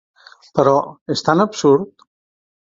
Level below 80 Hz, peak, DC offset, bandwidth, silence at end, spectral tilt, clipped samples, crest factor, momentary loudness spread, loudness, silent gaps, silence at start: -60 dBFS; 0 dBFS; under 0.1%; 7.8 kHz; 0.85 s; -5.5 dB/octave; under 0.1%; 18 dB; 9 LU; -17 LUFS; 1.01-1.06 s; 0.55 s